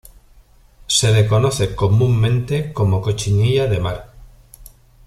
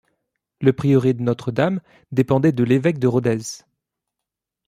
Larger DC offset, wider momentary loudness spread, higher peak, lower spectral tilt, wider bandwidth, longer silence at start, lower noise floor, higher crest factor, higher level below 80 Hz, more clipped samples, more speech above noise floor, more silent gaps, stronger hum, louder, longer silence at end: neither; about the same, 7 LU vs 9 LU; about the same, -4 dBFS vs -2 dBFS; second, -5 dB/octave vs -7.5 dB/octave; about the same, 13.5 kHz vs 13.5 kHz; first, 0.9 s vs 0.6 s; second, -48 dBFS vs -84 dBFS; about the same, 14 dB vs 18 dB; first, -38 dBFS vs -56 dBFS; neither; second, 33 dB vs 66 dB; neither; neither; about the same, -17 LUFS vs -19 LUFS; second, 0.4 s vs 1.1 s